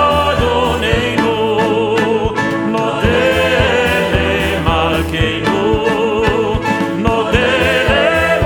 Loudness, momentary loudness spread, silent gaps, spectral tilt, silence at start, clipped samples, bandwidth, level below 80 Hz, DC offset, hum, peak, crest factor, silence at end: -14 LUFS; 4 LU; none; -5.5 dB/octave; 0 s; under 0.1%; over 20 kHz; -28 dBFS; under 0.1%; none; 0 dBFS; 14 dB; 0 s